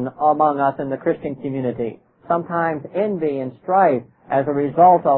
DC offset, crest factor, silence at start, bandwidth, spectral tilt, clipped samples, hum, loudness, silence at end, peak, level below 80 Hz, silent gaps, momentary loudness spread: under 0.1%; 16 dB; 0 s; 4.2 kHz; -12.5 dB/octave; under 0.1%; none; -20 LUFS; 0 s; -2 dBFS; -60 dBFS; none; 11 LU